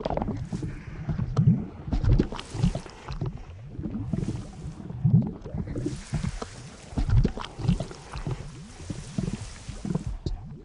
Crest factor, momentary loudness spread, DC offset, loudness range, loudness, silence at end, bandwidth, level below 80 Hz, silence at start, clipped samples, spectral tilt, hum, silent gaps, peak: 20 dB; 15 LU; under 0.1%; 3 LU; -30 LUFS; 0 s; 11 kHz; -34 dBFS; 0 s; under 0.1%; -7.5 dB/octave; none; none; -8 dBFS